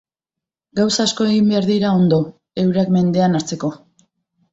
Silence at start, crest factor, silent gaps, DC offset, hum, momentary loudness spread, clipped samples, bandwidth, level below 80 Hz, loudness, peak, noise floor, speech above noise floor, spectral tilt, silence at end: 0.75 s; 14 dB; none; under 0.1%; none; 10 LU; under 0.1%; 8 kHz; -56 dBFS; -17 LUFS; -4 dBFS; -86 dBFS; 70 dB; -6 dB/octave; 0.75 s